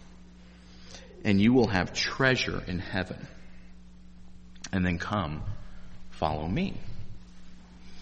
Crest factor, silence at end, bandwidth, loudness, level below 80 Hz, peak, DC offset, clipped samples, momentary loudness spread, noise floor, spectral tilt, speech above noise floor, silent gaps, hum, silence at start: 22 dB; 0 s; 8.4 kHz; -28 LUFS; -46 dBFS; -8 dBFS; under 0.1%; under 0.1%; 24 LU; -50 dBFS; -5.5 dB/octave; 23 dB; none; none; 0 s